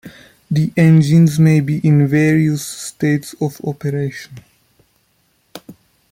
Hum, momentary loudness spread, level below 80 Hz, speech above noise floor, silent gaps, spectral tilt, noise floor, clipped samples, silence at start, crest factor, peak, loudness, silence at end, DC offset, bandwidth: none; 12 LU; -52 dBFS; 47 dB; none; -7 dB/octave; -61 dBFS; under 0.1%; 0.05 s; 14 dB; -2 dBFS; -15 LUFS; 0.4 s; under 0.1%; 15.5 kHz